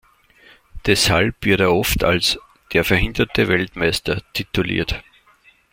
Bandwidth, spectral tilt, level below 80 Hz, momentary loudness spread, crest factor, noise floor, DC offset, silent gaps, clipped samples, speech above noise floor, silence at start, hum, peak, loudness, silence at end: 16.5 kHz; -4 dB/octave; -34 dBFS; 8 LU; 20 dB; -54 dBFS; under 0.1%; none; under 0.1%; 36 dB; 0.75 s; none; 0 dBFS; -18 LUFS; 0.7 s